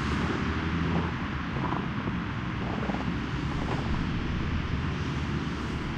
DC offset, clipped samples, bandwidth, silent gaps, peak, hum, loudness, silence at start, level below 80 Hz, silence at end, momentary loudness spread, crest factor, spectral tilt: under 0.1%; under 0.1%; 9.4 kHz; none; -14 dBFS; none; -31 LUFS; 0 s; -38 dBFS; 0 s; 3 LU; 16 dB; -7 dB/octave